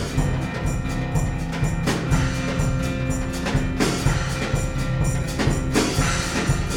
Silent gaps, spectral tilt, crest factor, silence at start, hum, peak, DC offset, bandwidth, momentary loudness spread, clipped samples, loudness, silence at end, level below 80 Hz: none; -5 dB/octave; 16 dB; 0 s; none; -6 dBFS; under 0.1%; 17 kHz; 4 LU; under 0.1%; -23 LUFS; 0 s; -28 dBFS